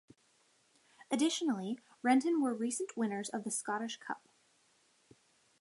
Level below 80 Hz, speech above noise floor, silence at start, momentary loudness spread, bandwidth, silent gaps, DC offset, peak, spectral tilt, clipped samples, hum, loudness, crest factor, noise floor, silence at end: -88 dBFS; 37 dB; 1 s; 12 LU; 11.5 kHz; none; under 0.1%; -16 dBFS; -3.5 dB/octave; under 0.1%; none; -35 LUFS; 20 dB; -72 dBFS; 1.45 s